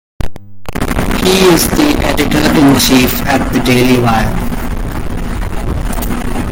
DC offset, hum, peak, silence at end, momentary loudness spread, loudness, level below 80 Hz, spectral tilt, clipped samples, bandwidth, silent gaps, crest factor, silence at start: under 0.1%; none; 0 dBFS; 0 s; 13 LU; -12 LUFS; -20 dBFS; -4.5 dB/octave; under 0.1%; 17 kHz; none; 12 dB; 0.2 s